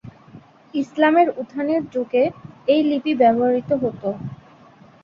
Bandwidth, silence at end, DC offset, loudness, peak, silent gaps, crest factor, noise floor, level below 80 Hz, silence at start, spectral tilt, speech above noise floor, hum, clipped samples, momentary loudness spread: 7 kHz; 0.7 s; under 0.1%; -20 LUFS; -4 dBFS; none; 18 dB; -48 dBFS; -60 dBFS; 0.05 s; -7.5 dB/octave; 29 dB; none; under 0.1%; 12 LU